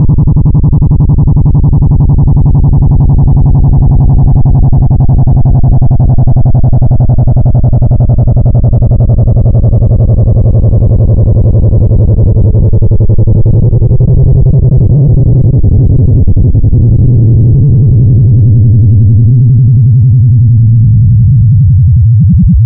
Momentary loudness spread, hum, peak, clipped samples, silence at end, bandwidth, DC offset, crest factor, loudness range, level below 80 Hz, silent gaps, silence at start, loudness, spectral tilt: 2 LU; none; 0 dBFS; under 0.1%; 0 s; 1.3 kHz; under 0.1%; 4 dB; 2 LU; -10 dBFS; none; 0 s; -6 LUFS; -20.5 dB/octave